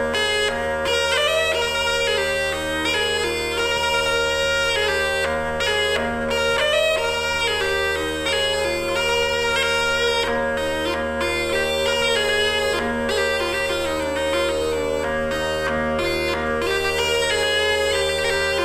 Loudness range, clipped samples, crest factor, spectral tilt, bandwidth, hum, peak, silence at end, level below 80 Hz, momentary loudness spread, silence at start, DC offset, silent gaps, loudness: 2 LU; under 0.1%; 14 dB; -2.5 dB/octave; 16 kHz; none; -8 dBFS; 0 s; -40 dBFS; 4 LU; 0 s; under 0.1%; none; -20 LUFS